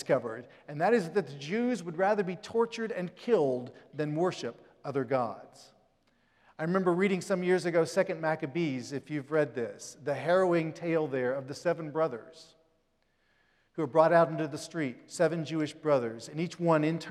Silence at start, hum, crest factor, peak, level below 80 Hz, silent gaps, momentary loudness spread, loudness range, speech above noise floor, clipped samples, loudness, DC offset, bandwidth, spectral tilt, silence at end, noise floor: 0 s; none; 22 dB; -10 dBFS; -78 dBFS; none; 10 LU; 4 LU; 43 dB; under 0.1%; -30 LUFS; under 0.1%; 13 kHz; -6 dB/octave; 0 s; -73 dBFS